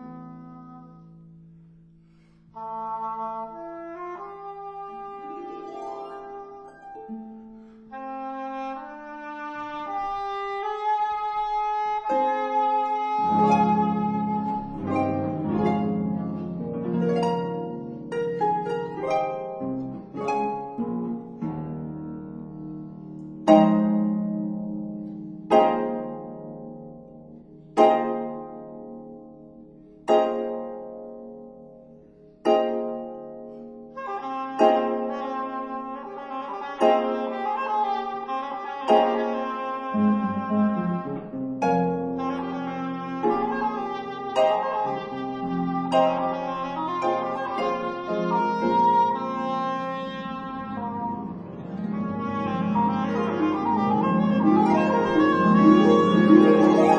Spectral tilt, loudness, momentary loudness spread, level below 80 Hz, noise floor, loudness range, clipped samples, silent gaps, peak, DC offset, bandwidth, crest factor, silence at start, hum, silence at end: -7.5 dB/octave; -24 LUFS; 19 LU; -60 dBFS; -55 dBFS; 13 LU; under 0.1%; none; -2 dBFS; under 0.1%; 10 kHz; 22 dB; 0 s; none; 0 s